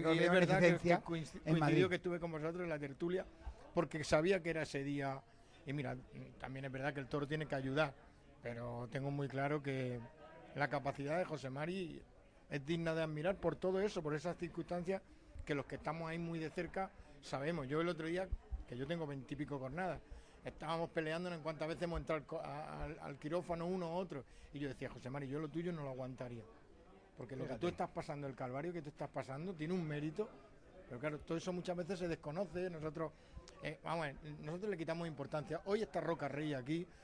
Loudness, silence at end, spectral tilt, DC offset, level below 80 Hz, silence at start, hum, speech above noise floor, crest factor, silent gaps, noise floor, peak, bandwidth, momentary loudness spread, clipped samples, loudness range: -41 LUFS; 0 s; -6.5 dB/octave; under 0.1%; -60 dBFS; 0 s; none; 22 dB; 22 dB; none; -63 dBFS; -18 dBFS; 10.5 kHz; 13 LU; under 0.1%; 6 LU